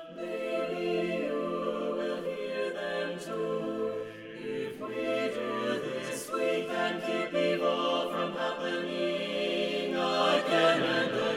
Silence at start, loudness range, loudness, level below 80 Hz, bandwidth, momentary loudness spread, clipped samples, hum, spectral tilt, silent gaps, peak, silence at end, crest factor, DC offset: 0 s; 5 LU; -31 LUFS; -72 dBFS; 16.5 kHz; 9 LU; under 0.1%; none; -4.5 dB/octave; none; -12 dBFS; 0 s; 20 dB; under 0.1%